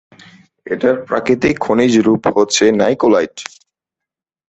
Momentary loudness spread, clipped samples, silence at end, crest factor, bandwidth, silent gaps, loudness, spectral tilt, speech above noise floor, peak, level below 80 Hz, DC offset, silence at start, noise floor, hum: 12 LU; under 0.1%; 1.05 s; 14 dB; 8.4 kHz; none; -14 LUFS; -4.5 dB/octave; 71 dB; 0 dBFS; -50 dBFS; under 0.1%; 0.65 s; -85 dBFS; none